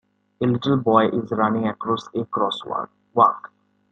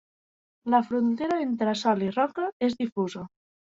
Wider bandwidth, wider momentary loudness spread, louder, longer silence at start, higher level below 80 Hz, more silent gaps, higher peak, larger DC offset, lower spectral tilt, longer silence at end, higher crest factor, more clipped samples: first, 8.6 kHz vs 7.8 kHz; about the same, 9 LU vs 9 LU; first, -21 LUFS vs -26 LUFS; second, 0.4 s vs 0.65 s; about the same, -64 dBFS vs -68 dBFS; second, none vs 2.52-2.60 s, 2.92-2.96 s; first, -2 dBFS vs -10 dBFS; neither; first, -7.5 dB/octave vs -6 dB/octave; about the same, 0.55 s vs 0.5 s; about the same, 20 dB vs 18 dB; neither